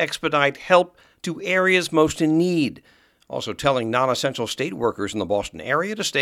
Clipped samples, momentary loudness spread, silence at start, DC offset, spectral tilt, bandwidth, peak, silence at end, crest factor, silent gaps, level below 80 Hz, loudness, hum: under 0.1%; 12 LU; 0 s; under 0.1%; -4.5 dB/octave; 15.5 kHz; -2 dBFS; 0 s; 20 dB; none; -54 dBFS; -21 LUFS; none